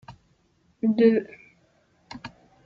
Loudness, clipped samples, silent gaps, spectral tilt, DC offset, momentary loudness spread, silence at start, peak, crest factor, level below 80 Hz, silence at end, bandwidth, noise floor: -22 LUFS; under 0.1%; none; -8 dB/octave; under 0.1%; 24 LU; 0.1 s; -6 dBFS; 20 dB; -66 dBFS; 0.35 s; 6.8 kHz; -65 dBFS